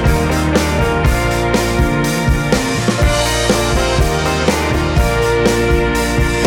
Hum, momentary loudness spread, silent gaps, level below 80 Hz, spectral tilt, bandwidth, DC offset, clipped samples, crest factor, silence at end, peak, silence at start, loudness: none; 2 LU; none; -20 dBFS; -5 dB/octave; 17.5 kHz; under 0.1%; under 0.1%; 12 dB; 0 s; 0 dBFS; 0 s; -14 LUFS